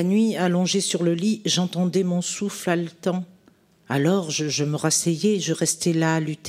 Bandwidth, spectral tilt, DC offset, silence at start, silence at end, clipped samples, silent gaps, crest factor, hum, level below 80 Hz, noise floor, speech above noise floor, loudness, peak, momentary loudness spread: 15.5 kHz; -4.5 dB/octave; under 0.1%; 0 s; 0 s; under 0.1%; none; 16 dB; none; -68 dBFS; -58 dBFS; 35 dB; -22 LUFS; -6 dBFS; 6 LU